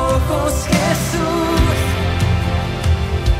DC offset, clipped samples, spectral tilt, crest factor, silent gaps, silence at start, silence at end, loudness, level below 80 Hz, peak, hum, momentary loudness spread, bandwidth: under 0.1%; under 0.1%; -5.5 dB/octave; 12 dB; none; 0 s; 0 s; -17 LUFS; -24 dBFS; -4 dBFS; none; 3 LU; 16 kHz